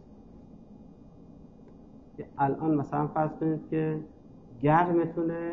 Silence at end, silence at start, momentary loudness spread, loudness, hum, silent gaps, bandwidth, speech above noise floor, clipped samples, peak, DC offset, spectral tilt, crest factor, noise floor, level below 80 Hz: 0 s; 0.1 s; 19 LU; -28 LUFS; none; none; 6 kHz; 24 dB; under 0.1%; -10 dBFS; under 0.1%; -10.5 dB/octave; 20 dB; -51 dBFS; -60 dBFS